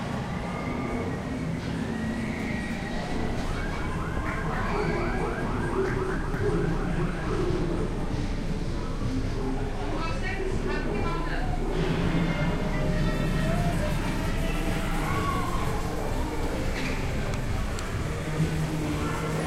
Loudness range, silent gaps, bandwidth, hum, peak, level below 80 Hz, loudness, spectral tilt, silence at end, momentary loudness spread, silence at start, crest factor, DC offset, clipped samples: 3 LU; none; 15 kHz; none; -14 dBFS; -32 dBFS; -29 LUFS; -6.5 dB/octave; 0 s; 4 LU; 0 s; 14 dB; under 0.1%; under 0.1%